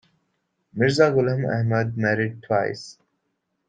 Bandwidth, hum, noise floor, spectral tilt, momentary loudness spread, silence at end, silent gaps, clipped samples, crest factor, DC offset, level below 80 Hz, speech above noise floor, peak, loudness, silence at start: 9.2 kHz; none; -75 dBFS; -6.5 dB/octave; 15 LU; 0.75 s; none; under 0.1%; 18 dB; under 0.1%; -60 dBFS; 54 dB; -6 dBFS; -22 LUFS; 0.75 s